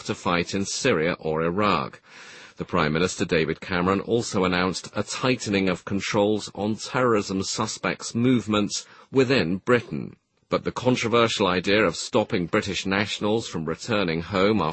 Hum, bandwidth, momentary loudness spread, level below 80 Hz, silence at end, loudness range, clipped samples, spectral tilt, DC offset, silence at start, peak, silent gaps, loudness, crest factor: none; 8.8 kHz; 8 LU; -54 dBFS; 0 s; 2 LU; under 0.1%; -4.5 dB/octave; under 0.1%; 0 s; -6 dBFS; none; -24 LUFS; 18 dB